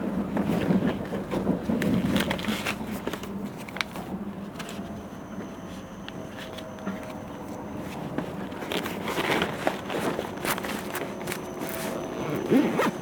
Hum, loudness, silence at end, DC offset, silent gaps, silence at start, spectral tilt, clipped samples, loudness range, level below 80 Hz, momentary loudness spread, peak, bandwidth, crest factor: none; -30 LUFS; 0 s; under 0.1%; none; 0 s; -5.5 dB/octave; under 0.1%; 9 LU; -52 dBFS; 13 LU; -6 dBFS; over 20 kHz; 24 dB